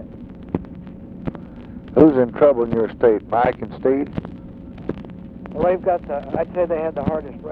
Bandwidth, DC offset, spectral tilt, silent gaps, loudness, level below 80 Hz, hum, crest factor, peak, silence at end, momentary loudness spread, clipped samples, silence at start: 4.8 kHz; under 0.1%; -10.5 dB/octave; none; -19 LUFS; -44 dBFS; none; 20 dB; 0 dBFS; 0 s; 22 LU; under 0.1%; 0 s